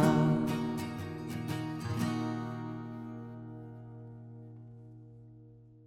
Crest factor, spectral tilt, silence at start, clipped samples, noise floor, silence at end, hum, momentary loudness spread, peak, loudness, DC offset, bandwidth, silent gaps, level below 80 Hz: 20 dB; -7 dB/octave; 0 s; under 0.1%; -55 dBFS; 0 s; none; 22 LU; -14 dBFS; -35 LUFS; under 0.1%; 16 kHz; none; -66 dBFS